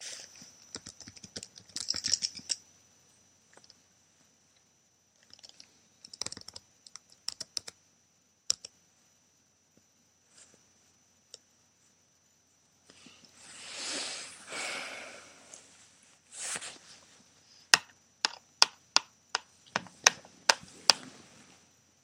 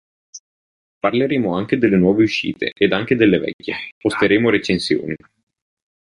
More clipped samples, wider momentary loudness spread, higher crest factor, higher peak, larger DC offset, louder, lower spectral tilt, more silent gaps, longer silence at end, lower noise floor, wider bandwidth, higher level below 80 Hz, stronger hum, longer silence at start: neither; first, 26 LU vs 10 LU; first, 38 dB vs 16 dB; about the same, 0 dBFS vs -2 dBFS; neither; second, -31 LUFS vs -18 LUFS; second, 1 dB/octave vs -6 dB/octave; second, none vs 0.40-1.01 s, 3.53-3.59 s, 3.92-4.01 s; about the same, 0.85 s vs 0.95 s; second, -69 dBFS vs under -90 dBFS; first, 16 kHz vs 11 kHz; second, -76 dBFS vs -50 dBFS; neither; second, 0 s vs 0.35 s